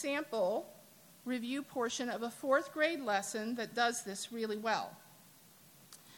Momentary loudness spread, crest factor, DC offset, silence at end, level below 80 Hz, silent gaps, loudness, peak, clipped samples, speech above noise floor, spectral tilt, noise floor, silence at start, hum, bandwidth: 15 LU; 20 dB; under 0.1%; 0 s; -84 dBFS; none; -36 LUFS; -16 dBFS; under 0.1%; 25 dB; -3 dB/octave; -61 dBFS; 0 s; none; 17.5 kHz